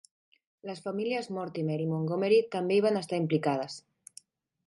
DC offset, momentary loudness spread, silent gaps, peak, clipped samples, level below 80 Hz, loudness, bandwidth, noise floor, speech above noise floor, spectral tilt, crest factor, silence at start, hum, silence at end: under 0.1%; 14 LU; none; -14 dBFS; under 0.1%; -80 dBFS; -30 LUFS; 11.5 kHz; -57 dBFS; 28 dB; -6.5 dB/octave; 16 dB; 0.65 s; none; 0.9 s